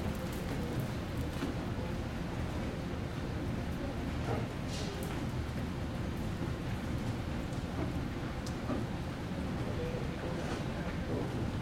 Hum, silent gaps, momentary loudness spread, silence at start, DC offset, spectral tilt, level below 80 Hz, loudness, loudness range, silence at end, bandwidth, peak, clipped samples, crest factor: none; none; 2 LU; 0 s; under 0.1%; -6.5 dB/octave; -46 dBFS; -38 LUFS; 0 LU; 0 s; 16.5 kHz; -22 dBFS; under 0.1%; 14 dB